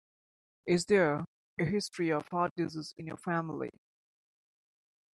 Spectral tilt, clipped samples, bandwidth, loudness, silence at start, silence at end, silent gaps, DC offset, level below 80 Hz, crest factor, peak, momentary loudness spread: -5.5 dB/octave; under 0.1%; 12 kHz; -32 LUFS; 0.65 s; 1.45 s; 1.27-1.57 s, 2.51-2.56 s; under 0.1%; -70 dBFS; 20 dB; -14 dBFS; 15 LU